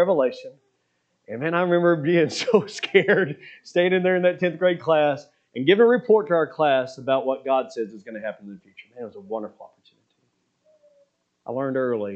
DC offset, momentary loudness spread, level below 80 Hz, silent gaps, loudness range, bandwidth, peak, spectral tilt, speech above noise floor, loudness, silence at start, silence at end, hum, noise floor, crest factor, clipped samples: under 0.1%; 19 LU; -78 dBFS; none; 16 LU; 8.6 kHz; -2 dBFS; -6 dB/octave; 50 dB; -22 LUFS; 0 s; 0 s; none; -72 dBFS; 20 dB; under 0.1%